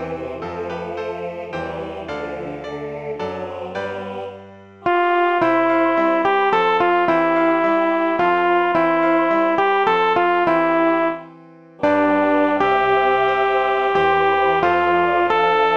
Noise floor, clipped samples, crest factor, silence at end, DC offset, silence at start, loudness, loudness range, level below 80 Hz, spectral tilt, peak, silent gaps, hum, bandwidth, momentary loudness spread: -44 dBFS; under 0.1%; 14 dB; 0 s; under 0.1%; 0 s; -18 LUFS; 11 LU; -54 dBFS; -6.5 dB/octave; -4 dBFS; none; none; 7.2 kHz; 12 LU